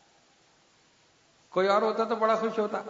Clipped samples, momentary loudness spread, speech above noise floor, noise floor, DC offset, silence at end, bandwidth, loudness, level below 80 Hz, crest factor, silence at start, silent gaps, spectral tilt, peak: under 0.1%; 5 LU; 37 dB; -63 dBFS; under 0.1%; 0 s; 7.8 kHz; -27 LUFS; -80 dBFS; 20 dB; 1.55 s; none; -5.5 dB/octave; -10 dBFS